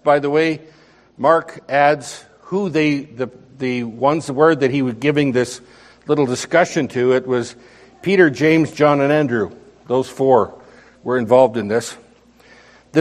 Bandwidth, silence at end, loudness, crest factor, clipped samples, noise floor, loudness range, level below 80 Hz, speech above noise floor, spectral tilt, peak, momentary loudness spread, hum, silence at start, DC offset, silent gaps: 13 kHz; 0 s; -17 LUFS; 18 dB; under 0.1%; -49 dBFS; 3 LU; -60 dBFS; 32 dB; -6 dB/octave; 0 dBFS; 13 LU; none; 0.05 s; under 0.1%; none